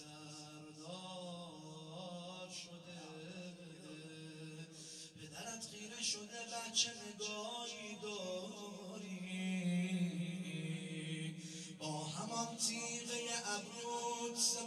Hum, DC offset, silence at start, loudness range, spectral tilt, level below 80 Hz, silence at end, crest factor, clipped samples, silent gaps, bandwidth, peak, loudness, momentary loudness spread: none; under 0.1%; 0 s; 9 LU; -3 dB/octave; -88 dBFS; 0 s; 24 dB; under 0.1%; none; 13.5 kHz; -20 dBFS; -43 LUFS; 14 LU